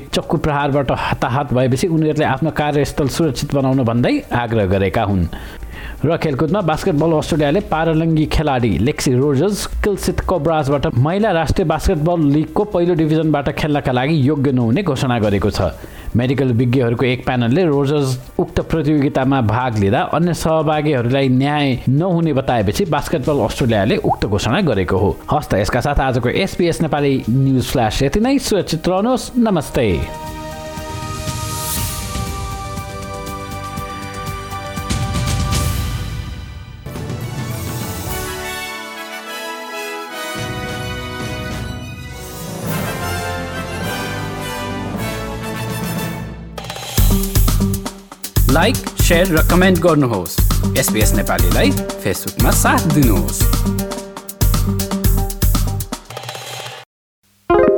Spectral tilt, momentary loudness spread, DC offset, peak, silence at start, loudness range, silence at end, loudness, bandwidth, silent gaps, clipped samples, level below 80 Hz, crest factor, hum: -5.5 dB/octave; 12 LU; under 0.1%; -2 dBFS; 0 s; 9 LU; 0 s; -17 LUFS; over 20 kHz; 56.86-57.22 s; under 0.1%; -26 dBFS; 16 dB; none